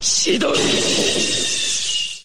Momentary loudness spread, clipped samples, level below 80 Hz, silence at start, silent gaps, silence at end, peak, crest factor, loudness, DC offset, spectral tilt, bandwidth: 2 LU; under 0.1%; -50 dBFS; 0 s; none; 0 s; -6 dBFS; 14 dB; -17 LUFS; 3%; -1.5 dB/octave; 16 kHz